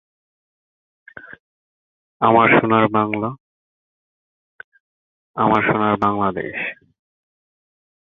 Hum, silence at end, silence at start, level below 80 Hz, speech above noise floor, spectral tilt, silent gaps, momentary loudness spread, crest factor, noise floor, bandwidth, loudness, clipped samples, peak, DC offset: none; 1.45 s; 1.25 s; -56 dBFS; over 73 dB; -8.5 dB/octave; 1.40-2.20 s, 3.40-4.72 s, 4.80-5.34 s; 15 LU; 20 dB; under -90 dBFS; 4.6 kHz; -17 LUFS; under 0.1%; 0 dBFS; under 0.1%